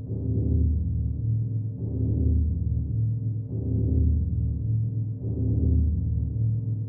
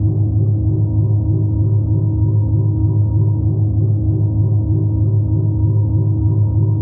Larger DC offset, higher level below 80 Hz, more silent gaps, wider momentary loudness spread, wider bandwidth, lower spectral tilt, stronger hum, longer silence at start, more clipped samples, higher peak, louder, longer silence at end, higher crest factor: neither; about the same, -30 dBFS vs -30 dBFS; neither; first, 6 LU vs 1 LU; second, 0.9 kHz vs 1.1 kHz; first, -19 dB/octave vs -17.5 dB/octave; neither; about the same, 0 s vs 0 s; neither; second, -12 dBFS vs -6 dBFS; second, -27 LUFS vs -16 LUFS; about the same, 0 s vs 0 s; about the same, 12 dB vs 8 dB